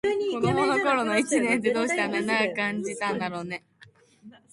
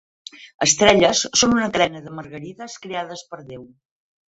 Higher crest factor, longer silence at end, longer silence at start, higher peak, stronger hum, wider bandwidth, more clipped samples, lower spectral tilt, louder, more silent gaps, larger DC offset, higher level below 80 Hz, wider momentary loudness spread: about the same, 18 dB vs 20 dB; second, 0.25 s vs 0.65 s; second, 0.05 s vs 0.35 s; second, -8 dBFS vs -2 dBFS; neither; first, 11.5 kHz vs 8.4 kHz; neither; first, -4.5 dB/octave vs -2.5 dB/octave; second, -25 LUFS vs -17 LUFS; second, none vs 0.54-0.59 s; neither; second, -64 dBFS vs -52 dBFS; second, 8 LU vs 24 LU